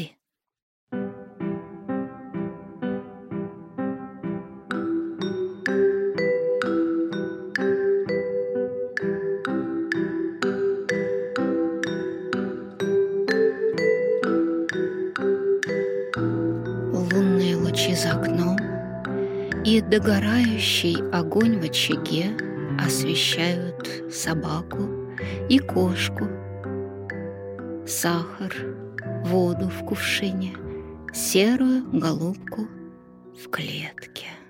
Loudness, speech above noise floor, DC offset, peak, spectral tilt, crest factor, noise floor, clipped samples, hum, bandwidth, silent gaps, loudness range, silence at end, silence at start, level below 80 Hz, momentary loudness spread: -25 LUFS; 50 dB; under 0.1%; -6 dBFS; -5 dB/octave; 18 dB; -73 dBFS; under 0.1%; none; 16.5 kHz; 0.62-0.87 s; 7 LU; 0.05 s; 0 s; -54 dBFS; 13 LU